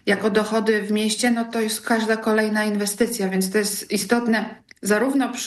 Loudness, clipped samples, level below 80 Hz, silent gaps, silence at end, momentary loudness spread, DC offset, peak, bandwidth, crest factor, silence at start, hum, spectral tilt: -21 LUFS; under 0.1%; -62 dBFS; none; 0 s; 4 LU; under 0.1%; -6 dBFS; 13 kHz; 16 dB; 0.05 s; none; -4 dB/octave